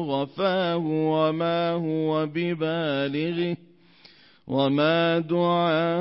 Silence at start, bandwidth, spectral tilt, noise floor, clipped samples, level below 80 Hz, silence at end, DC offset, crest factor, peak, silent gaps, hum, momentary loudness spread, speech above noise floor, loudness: 0 s; 5.8 kHz; -11 dB/octave; -54 dBFS; under 0.1%; -70 dBFS; 0 s; under 0.1%; 14 dB; -10 dBFS; none; none; 6 LU; 30 dB; -24 LUFS